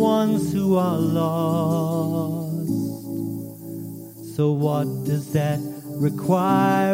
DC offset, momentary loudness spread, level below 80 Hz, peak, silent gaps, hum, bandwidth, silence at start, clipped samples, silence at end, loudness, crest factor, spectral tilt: under 0.1%; 14 LU; -58 dBFS; -6 dBFS; none; none; 16.5 kHz; 0 s; under 0.1%; 0 s; -23 LUFS; 14 dB; -7.5 dB/octave